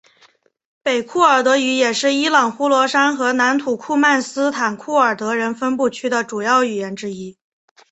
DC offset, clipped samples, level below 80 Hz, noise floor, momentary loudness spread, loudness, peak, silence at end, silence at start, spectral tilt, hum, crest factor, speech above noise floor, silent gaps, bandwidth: under 0.1%; under 0.1%; -66 dBFS; -55 dBFS; 8 LU; -17 LUFS; -2 dBFS; 0.6 s; 0.85 s; -3 dB/octave; none; 16 dB; 38 dB; none; 8.2 kHz